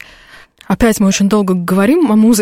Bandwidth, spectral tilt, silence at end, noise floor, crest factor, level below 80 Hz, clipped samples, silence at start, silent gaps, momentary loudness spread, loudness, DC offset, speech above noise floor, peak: 16.5 kHz; -5.5 dB/octave; 0 s; -41 dBFS; 10 dB; -36 dBFS; under 0.1%; 0.7 s; none; 4 LU; -12 LUFS; under 0.1%; 30 dB; -2 dBFS